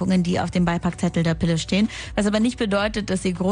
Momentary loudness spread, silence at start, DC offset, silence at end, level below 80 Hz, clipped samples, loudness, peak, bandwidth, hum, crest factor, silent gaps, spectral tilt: 3 LU; 0 s; under 0.1%; 0 s; -40 dBFS; under 0.1%; -22 LUFS; -8 dBFS; 10 kHz; none; 14 dB; none; -6 dB/octave